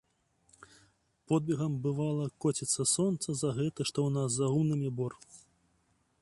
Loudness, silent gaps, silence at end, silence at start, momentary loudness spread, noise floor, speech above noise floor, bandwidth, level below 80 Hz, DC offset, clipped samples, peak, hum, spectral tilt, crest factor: -32 LUFS; none; 0.8 s; 1.3 s; 5 LU; -73 dBFS; 42 dB; 11.5 kHz; -68 dBFS; under 0.1%; under 0.1%; -16 dBFS; none; -5.5 dB/octave; 16 dB